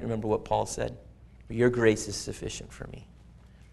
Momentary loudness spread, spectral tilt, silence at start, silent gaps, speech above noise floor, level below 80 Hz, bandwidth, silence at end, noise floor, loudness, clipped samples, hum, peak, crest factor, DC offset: 20 LU; -5 dB/octave; 0 s; none; 24 dB; -48 dBFS; 12 kHz; 0.15 s; -52 dBFS; -29 LUFS; under 0.1%; none; -8 dBFS; 22 dB; under 0.1%